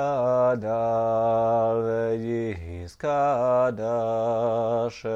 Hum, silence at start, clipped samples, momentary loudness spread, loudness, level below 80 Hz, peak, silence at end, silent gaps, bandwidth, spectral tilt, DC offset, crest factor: none; 0 s; under 0.1%; 7 LU; -24 LUFS; -54 dBFS; -12 dBFS; 0 s; none; 8 kHz; -7.5 dB/octave; under 0.1%; 12 dB